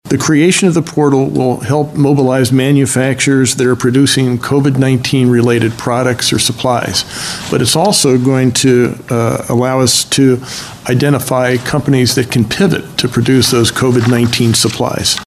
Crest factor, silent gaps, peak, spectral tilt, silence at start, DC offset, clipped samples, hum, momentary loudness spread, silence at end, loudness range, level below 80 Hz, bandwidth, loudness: 12 dB; none; 0 dBFS; -4.5 dB/octave; 0.05 s; under 0.1%; under 0.1%; none; 5 LU; 0 s; 1 LU; -42 dBFS; 14 kHz; -11 LUFS